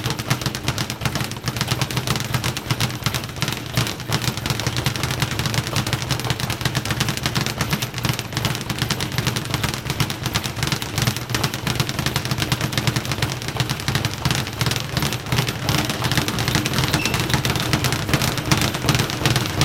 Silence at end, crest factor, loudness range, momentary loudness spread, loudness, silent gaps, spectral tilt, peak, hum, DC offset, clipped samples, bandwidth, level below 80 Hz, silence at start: 0 s; 22 dB; 3 LU; 4 LU; -22 LUFS; none; -4 dB/octave; 0 dBFS; none; 0.2%; under 0.1%; 17 kHz; -40 dBFS; 0 s